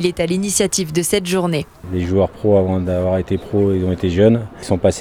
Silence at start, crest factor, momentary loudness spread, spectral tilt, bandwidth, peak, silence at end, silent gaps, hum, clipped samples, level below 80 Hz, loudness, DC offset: 0 s; 16 dB; 6 LU; -5.5 dB/octave; 16.5 kHz; 0 dBFS; 0 s; none; none; under 0.1%; -40 dBFS; -17 LUFS; under 0.1%